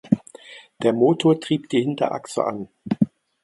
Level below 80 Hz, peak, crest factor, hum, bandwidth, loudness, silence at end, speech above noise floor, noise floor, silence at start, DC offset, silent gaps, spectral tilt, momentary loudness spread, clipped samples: -64 dBFS; -2 dBFS; 20 dB; none; 11.5 kHz; -22 LUFS; 0.35 s; 24 dB; -45 dBFS; 0.05 s; under 0.1%; none; -6.5 dB/octave; 12 LU; under 0.1%